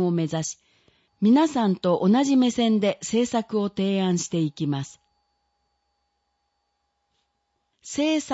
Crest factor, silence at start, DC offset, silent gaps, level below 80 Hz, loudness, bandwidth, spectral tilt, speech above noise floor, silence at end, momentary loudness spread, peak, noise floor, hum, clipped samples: 16 dB; 0 s; under 0.1%; none; -66 dBFS; -23 LUFS; 8 kHz; -5.5 dB/octave; 53 dB; 0 s; 10 LU; -10 dBFS; -75 dBFS; none; under 0.1%